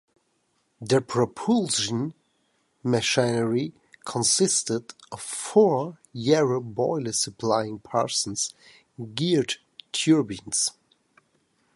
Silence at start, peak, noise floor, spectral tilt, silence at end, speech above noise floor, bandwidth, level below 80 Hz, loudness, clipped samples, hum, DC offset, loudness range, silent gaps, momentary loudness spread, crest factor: 0.8 s; -6 dBFS; -71 dBFS; -4 dB/octave; 1.05 s; 46 dB; 11.5 kHz; -64 dBFS; -25 LUFS; under 0.1%; none; under 0.1%; 3 LU; none; 13 LU; 20 dB